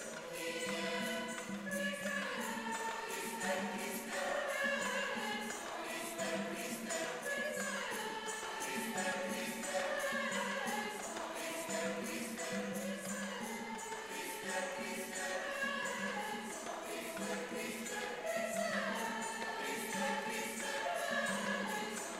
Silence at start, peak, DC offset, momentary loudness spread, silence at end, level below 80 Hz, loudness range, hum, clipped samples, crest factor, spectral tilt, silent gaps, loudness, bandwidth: 0 s; -24 dBFS; under 0.1%; 5 LU; 0 s; -74 dBFS; 2 LU; none; under 0.1%; 16 dB; -2.5 dB/octave; none; -39 LUFS; 16 kHz